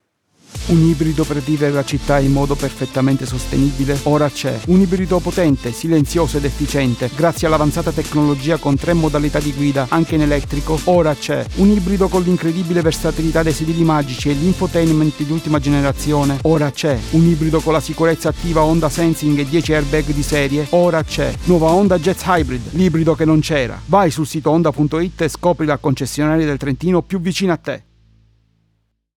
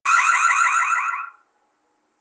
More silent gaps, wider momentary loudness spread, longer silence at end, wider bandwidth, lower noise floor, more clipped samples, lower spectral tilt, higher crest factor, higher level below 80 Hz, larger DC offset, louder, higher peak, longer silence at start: neither; second, 5 LU vs 14 LU; first, 1.4 s vs 0.9 s; first, 17.5 kHz vs 10 kHz; about the same, -65 dBFS vs -68 dBFS; neither; first, -6.5 dB/octave vs 5 dB/octave; about the same, 14 dB vs 16 dB; first, -30 dBFS vs under -90 dBFS; neither; about the same, -16 LUFS vs -18 LUFS; first, -2 dBFS vs -6 dBFS; first, 0.5 s vs 0.05 s